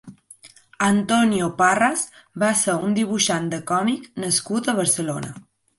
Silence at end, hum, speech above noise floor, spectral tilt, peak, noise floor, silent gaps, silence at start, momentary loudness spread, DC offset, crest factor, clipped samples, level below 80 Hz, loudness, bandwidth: 0.4 s; none; 28 dB; -3.5 dB/octave; -4 dBFS; -49 dBFS; none; 0.05 s; 9 LU; under 0.1%; 18 dB; under 0.1%; -60 dBFS; -21 LUFS; 12 kHz